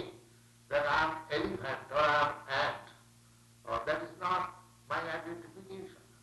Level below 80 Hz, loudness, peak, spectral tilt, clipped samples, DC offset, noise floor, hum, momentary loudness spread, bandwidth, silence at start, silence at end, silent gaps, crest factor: -62 dBFS; -33 LUFS; -16 dBFS; -4.5 dB/octave; under 0.1%; under 0.1%; -61 dBFS; none; 19 LU; 12 kHz; 0 s; 0.2 s; none; 20 dB